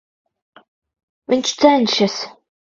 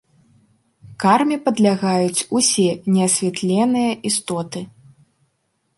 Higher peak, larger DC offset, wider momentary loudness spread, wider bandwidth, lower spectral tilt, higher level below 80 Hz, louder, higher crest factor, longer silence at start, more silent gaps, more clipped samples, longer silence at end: about the same, 0 dBFS vs -2 dBFS; neither; first, 13 LU vs 10 LU; second, 7.8 kHz vs 12 kHz; about the same, -3.5 dB/octave vs -4 dB/octave; about the same, -64 dBFS vs -64 dBFS; about the same, -16 LUFS vs -18 LUFS; about the same, 20 dB vs 18 dB; first, 1.3 s vs 0.85 s; neither; neither; second, 0.5 s vs 1.1 s